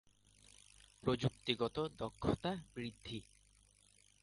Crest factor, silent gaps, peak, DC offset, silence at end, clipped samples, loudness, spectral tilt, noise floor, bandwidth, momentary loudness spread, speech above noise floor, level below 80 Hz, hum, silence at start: 24 dB; none; -18 dBFS; under 0.1%; 1 s; under 0.1%; -41 LUFS; -6 dB/octave; -70 dBFS; 11.5 kHz; 23 LU; 30 dB; -62 dBFS; none; 1.05 s